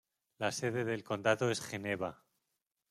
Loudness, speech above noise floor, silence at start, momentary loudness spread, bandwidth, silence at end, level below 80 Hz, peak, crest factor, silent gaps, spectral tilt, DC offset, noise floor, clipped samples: -36 LUFS; 51 dB; 0.4 s; 7 LU; 14.5 kHz; 0.75 s; -76 dBFS; -14 dBFS; 24 dB; none; -4.5 dB/octave; under 0.1%; -86 dBFS; under 0.1%